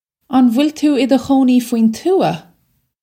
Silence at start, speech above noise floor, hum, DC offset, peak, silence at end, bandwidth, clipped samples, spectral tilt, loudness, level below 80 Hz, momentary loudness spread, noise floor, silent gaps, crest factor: 0.3 s; 49 dB; none; under 0.1%; 0 dBFS; 0.6 s; 16 kHz; under 0.1%; -6 dB/octave; -14 LUFS; -56 dBFS; 5 LU; -62 dBFS; none; 14 dB